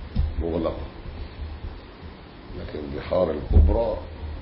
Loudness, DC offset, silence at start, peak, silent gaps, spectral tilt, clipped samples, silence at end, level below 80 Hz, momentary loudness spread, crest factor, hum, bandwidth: -26 LUFS; under 0.1%; 0 s; -6 dBFS; none; -12 dB/octave; under 0.1%; 0 s; -28 dBFS; 21 LU; 18 dB; none; 5.6 kHz